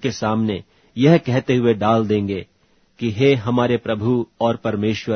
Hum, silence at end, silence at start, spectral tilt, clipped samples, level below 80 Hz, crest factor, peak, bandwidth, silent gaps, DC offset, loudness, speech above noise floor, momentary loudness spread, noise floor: none; 0 s; 0 s; -7 dB/octave; under 0.1%; -54 dBFS; 18 dB; 0 dBFS; 6.6 kHz; none; under 0.1%; -19 LUFS; 36 dB; 10 LU; -54 dBFS